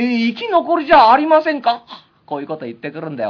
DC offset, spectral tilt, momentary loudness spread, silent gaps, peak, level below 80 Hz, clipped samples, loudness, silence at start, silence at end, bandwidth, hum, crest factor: under 0.1%; -6.5 dB/octave; 18 LU; none; -2 dBFS; -50 dBFS; under 0.1%; -14 LUFS; 0 s; 0 s; 5.4 kHz; none; 14 dB